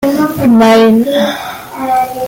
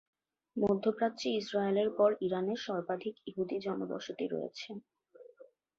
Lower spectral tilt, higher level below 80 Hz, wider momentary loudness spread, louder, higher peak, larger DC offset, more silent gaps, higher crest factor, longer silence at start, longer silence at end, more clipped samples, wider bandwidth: about the same, -5.5 dB/octave vs -6 dB/octave; first, -44 dBFS vs -74 dBFS; about the same, 14 LU vs 12 LU; first, -9 LUFS vs -34 LUFS; first, 0 dBFS vs -16 dBFS; neither; neither; second, 8 dB vs 20 dB; second, 0 s vs 0.55 s; second, 0 s vs 0.35 s; neither; first, 17 kHz vs 7.6 kHz